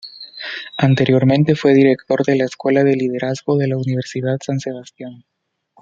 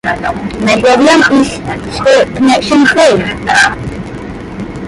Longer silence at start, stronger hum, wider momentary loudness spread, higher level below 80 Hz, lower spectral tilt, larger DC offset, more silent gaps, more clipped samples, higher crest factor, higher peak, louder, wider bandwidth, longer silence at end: about the same, 0.05 s vs 0.05 s; neither; about the same, 17 LU vs 17 LU; second, -58 dBFS vs -34 dBFS; first, -7 dB/octave vs -4.5 dB/octave; neither; neither; neither; first, 16 dB vs 10 dB; about the same, -2 dBFS vs 0 dBFS; second, -17 LUFS vs -9 LUFS; second, 7.6 kHz vs 11.5 kHz; first, 0.65 s vs 0 s